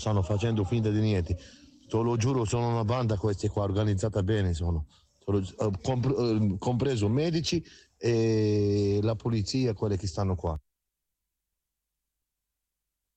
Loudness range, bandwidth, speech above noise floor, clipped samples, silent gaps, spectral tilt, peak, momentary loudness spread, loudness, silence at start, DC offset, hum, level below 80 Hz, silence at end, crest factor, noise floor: 5 LU; 8.8 kHz; 59 dB; under 0.1%; none; -7 dB/octave; -16 dBFS; 7 LU; -28 LUFS; 0 s; under 0.1%; none; -48 dBFS; 2.6 s; 12 dB; -86 dBFS